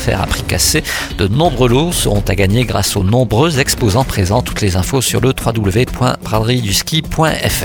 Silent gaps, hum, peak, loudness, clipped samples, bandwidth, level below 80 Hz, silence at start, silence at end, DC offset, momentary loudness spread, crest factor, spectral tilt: none; none; 0 dBFS; -14 LUFS; under 0.1%; 19 kHz; -26 dBFS; 0 s; 0 s; under 0.1%; 4 LU; 14 dB; -4.5 dB/octave